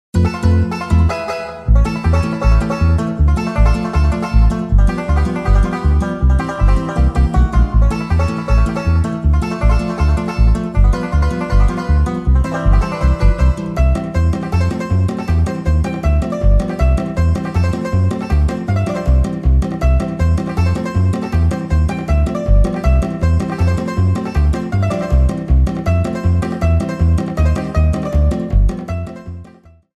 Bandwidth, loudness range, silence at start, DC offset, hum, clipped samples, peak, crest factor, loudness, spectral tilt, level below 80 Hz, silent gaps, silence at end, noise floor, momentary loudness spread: 10.5 kHz; 1 LU; 0.15 s; under 0.1%; none; under 0.1%; 0 dBFS; 14 dB; -16 LUFS; -8 dB/octave; -16 dBFS; none; 0.55 s; -43 dBFS; 2 LU